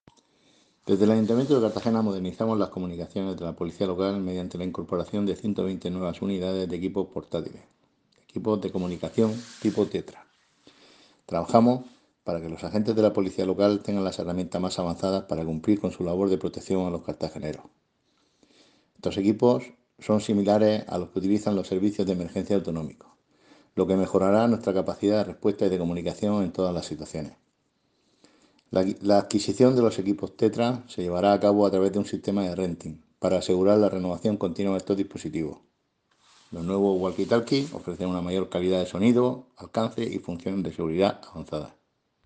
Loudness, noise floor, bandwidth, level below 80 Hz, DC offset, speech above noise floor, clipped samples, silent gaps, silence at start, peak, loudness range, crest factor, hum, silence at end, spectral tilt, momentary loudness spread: -26 LUFS; -71 dBFS; 9.4 kHz; -62 dBFS; under 0.1%; 46 dB; under 0.1%; none; 0.85 s; -4 dBFS; 5 LU; 24 dB; none; 0.6 s; -7 dB/octave; 12 LU